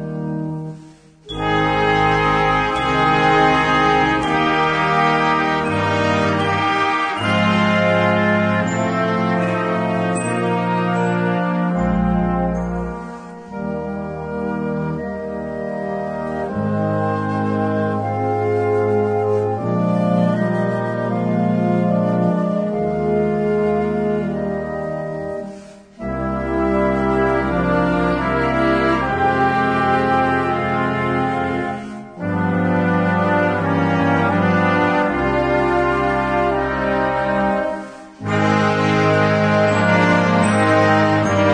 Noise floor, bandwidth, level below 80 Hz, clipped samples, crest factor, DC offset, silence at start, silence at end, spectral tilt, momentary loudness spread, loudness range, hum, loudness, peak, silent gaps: -43 dBFS; 10 kHz; -38 dBFS; under 0.1%; 14 dB; under 0.1%; 0 s; 0 s; -6.5 dB/octave; 10 LU; 6 LU; none; -18 LUFS; -2 dBFS; none